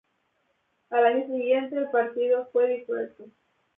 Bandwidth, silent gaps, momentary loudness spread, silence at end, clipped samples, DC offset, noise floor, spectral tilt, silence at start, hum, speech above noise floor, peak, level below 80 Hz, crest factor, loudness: 3.8 kHz; none; 9 LU; 0.5 s; under 0.1%; under 0.1%; -72 dBFS; -7.5 dB/octave; 0.9 s; none; 47 dB; -8 dBFS; -82 dBFS; 18 dB; -25 LUFS